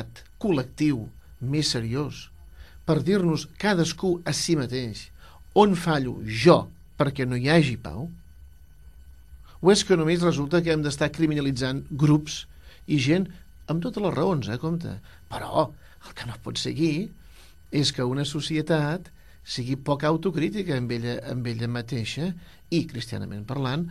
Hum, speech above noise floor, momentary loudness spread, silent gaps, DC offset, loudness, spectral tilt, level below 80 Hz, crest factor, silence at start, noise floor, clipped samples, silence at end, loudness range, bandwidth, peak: none; 26 dB; 15 LU; none; 0.2%; -25 LUFS; -5.5 dB/octave; -50 dBFS; 22 dB; 0 s; -50 dBFS; under 0.1%; 0 s; 6 LU; 14 kHz; -4 dBFS